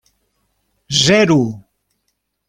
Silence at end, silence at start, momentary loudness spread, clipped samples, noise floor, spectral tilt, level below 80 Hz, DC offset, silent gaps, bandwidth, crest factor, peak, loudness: 0.9 s; 0.9 s; 14 LU; under 0.1%; -71 dBFS; -4 dB/octave; -52 dBFS; under 0.1%; none; 15.5 kHz; 18 dB; 0 dBFS; -14 LUFS